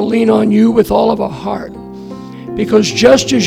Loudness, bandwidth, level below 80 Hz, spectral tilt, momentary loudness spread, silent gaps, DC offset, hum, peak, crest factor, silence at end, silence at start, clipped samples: -11 LUFS; 15.5 kHz; -40 dBFS; -5 dB/octave; 20 LU; none; under 0.1%; none; 0 dBFS; 12 dB; 0 s; 0 s; 0.2%